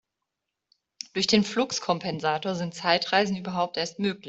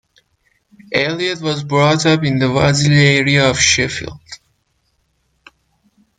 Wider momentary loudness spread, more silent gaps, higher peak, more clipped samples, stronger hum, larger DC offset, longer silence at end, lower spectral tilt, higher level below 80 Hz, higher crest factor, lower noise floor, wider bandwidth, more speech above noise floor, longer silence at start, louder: second, 6 LU vs 12 LU; neither; second, -6 dBFS vs 0 dBFS; neither; neither; neither; second, 0 s vs 1.85 s; about the same, -4 dB/octave vs -4 dB/octave; second, -66 dBFS vs -46 dBFS; first, 22 dB vs 16 dB; first, -84 dBFS vs -64 dBFS; second, 8.2 kHz vs 9.4 kHz; first, 58 dB vs 50 dB; first, 1.15 s vs 0.9 s; second, -26 LUFS vs -14 LUFS